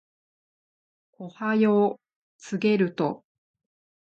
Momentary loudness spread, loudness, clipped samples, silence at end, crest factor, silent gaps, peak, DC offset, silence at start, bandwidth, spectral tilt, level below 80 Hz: 22 LU; -25 LUFS; under 0.1%; 1 s; 16 dB; 2.16-2.39 s; -10 dBFS; under 0.1%; 1.2 s; 7.8 kHz; -7 dB/octave; -76 dBFS